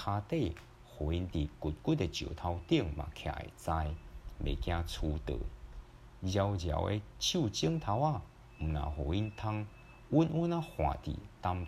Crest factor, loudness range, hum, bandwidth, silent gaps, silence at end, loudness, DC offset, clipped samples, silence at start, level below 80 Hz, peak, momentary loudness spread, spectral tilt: 20 dB; 3 LU; none; 14 kHz; none; 0 s; -36 LUFS; under 0.1%; under 0.1%; 0 s; -46 dBFS; -14 dBFS; 11 LU; -6 dB/octave